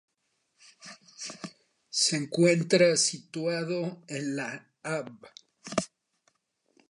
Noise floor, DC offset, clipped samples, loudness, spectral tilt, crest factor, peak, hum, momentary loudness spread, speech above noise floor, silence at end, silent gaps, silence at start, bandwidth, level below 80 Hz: -77 dBFS; under 0.1%; under 0.1%; -28 LUFS; -3.5 dB/octave; 20 dB; -10 dBFS; none; 23 LU; 49 dB; 1.05 s; none; 0.85 s; 11.5 kHz; -76 dBFS